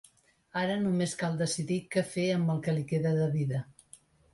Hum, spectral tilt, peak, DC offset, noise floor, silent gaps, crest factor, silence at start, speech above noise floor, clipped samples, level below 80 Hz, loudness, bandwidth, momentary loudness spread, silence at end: none; -6 dB/octave; -16 dBFS; under 0.1%; -63 dBFS; none; 16 dB; 0.55 s; 34 dB; under 0.1%; -66 dBFS; -31 LUFS; 11.5 kHz; 5 LU; 0.6 s